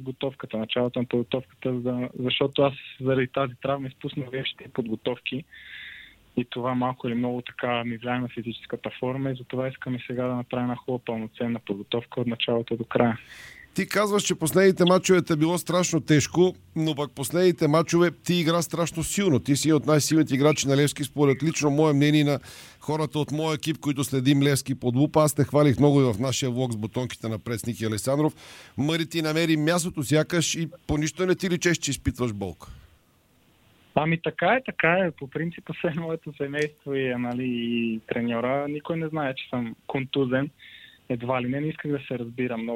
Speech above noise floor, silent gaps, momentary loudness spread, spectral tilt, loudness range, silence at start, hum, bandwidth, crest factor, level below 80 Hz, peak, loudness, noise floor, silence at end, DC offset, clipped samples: 37 dB; none; 11 LU; -5 dB/octave; 7 LU; 0 s; none; 16.5 kHz; 20 dB; -54 dBFS; -6 dBFS; -25 LUFS; -62 dBFS; 0 s; under 0.1%; under 0.1%